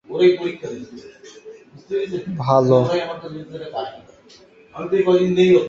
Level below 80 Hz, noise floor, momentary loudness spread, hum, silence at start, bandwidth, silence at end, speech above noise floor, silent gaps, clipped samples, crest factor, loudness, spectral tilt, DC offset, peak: -60 dBFS; -48 dBFS; 22 LU; none; 0.1 s; 7.4 kHz; 0 s; 30 dB; none; under 0.1%; 18 dB; -19 LUFS; -7.5 dB/octave; under 0.1%; -2 dBFS